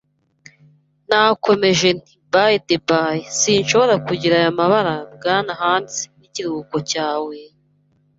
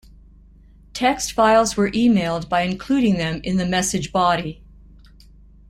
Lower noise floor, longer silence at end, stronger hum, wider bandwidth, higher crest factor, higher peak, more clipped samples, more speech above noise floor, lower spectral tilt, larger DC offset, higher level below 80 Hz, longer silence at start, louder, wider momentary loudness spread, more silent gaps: first, -60 dBFS vs -48 dBFS; second, 0.75 s vs 1.15 s; second, none vs 50 Hz at -40 dBFS; second, 8 kHz vs 15.5 kHz; about the same, 18 dB vs 16 dB; first, 0 dBFS vs -4 dBFS; neither; first, 43 dB vs 29 dB; about the same, -3.5 dB/octave vs -4.5 dB/octave; neither; second, -58 dBFS vs -44 dBFS; first, 1.1 s vs 0.95 s; about the same, -17 LUFS vs -19 LUFS; first, 11 LU vs 7 LU; neither